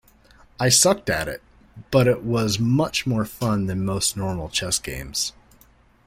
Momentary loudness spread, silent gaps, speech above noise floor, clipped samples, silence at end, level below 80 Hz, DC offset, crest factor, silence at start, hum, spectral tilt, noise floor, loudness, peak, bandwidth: 10 LU; none; 33 dB; under 0.1%; 0.75 s; -46 dBFS; under 0.1%; 20 dB; 0.6 s; none; -4 dB/octave; -55 dBFS; -22 LUFS; -2 dBFS; 16.5 kHz